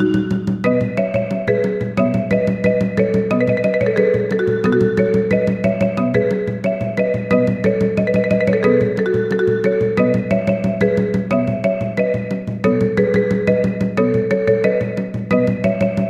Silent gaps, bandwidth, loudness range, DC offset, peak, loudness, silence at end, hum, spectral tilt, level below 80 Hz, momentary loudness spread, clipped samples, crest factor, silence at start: none; 8 kHz; 1 LU; under 0.1%; -2 dBFS; -17 LUFS; 0 s; none; -8.5 dB/octave; -44 dBFS; 4 LU; under 0.1%; 14 dB; 0 s